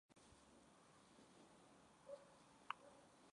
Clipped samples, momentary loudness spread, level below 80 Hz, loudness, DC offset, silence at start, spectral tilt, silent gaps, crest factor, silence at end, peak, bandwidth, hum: under 0.1%; 14 LU; -86 dBFS; -62 LUFS; under 0.1%; 0.1 s; -3 dB/octave; none; 34 dB; 0 s; -30 dBFS; 11 kHz; none